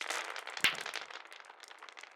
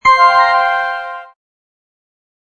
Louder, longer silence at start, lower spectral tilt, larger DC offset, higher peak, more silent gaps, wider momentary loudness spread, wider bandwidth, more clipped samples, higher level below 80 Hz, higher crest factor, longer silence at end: second, -35 LUFS vs -11 LUFS; about the same, 0 s vs 0.05 s; second, 0.5 dB/octave vs -1 dB/octave; neither; second, -12 dBFS vs 0 dBFS; neither; about the same, 20 LU vs 19 LU; first, over 20 kHz vs 9.4 kHz; neither; second, -80 dBFS vs -54 dBFS; first, 28 dB vs 14 dB; second, 0 s vs 1.35 s